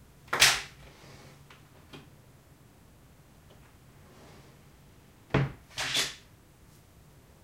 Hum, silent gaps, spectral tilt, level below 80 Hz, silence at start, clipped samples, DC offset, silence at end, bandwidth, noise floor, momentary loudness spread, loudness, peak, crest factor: none; none; -2 dB/octave; -56 dBFS; 0.3 s; under 0.1%; under 0.1%; 1.3 s; 16 kHz; -57 dBFS; 29 LU; -27 LUFS; -6 dBFS; 30 dB